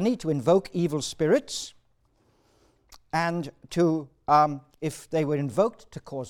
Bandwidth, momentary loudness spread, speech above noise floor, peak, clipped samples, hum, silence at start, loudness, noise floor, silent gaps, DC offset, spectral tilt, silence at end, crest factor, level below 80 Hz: 16.5 kHz; 12 LU; 41 dB; -8 dBFS; under 0.1%; none; 0 s; -26 LUFS; -66 dBFS; none; under 0.1%; -6 dB/octave; 0 s; 18 dB; -60 dBFS